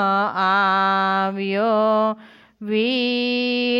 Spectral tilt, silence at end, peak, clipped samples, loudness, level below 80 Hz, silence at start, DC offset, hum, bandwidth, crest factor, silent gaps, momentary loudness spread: -6.5 dB/octave; 0 s; -8 dBFS; under 0.1%; -19 LUFS; -74 dBFS; 0 s; under 0.1%; none; 7.6 kHz; 12 dB; none; 7 LU